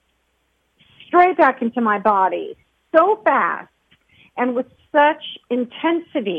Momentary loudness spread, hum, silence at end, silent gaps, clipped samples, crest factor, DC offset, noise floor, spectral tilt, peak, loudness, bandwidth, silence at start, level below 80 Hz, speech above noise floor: 12 LU; none; 0 s; none; under 0.1%; 18 dB; under 0.1%; -67 dBFS; -7 dB/octave; -2 dBFS; -18 LUFS; 5.2 kHz; 1.1 s; -66 dBFS; 48 dB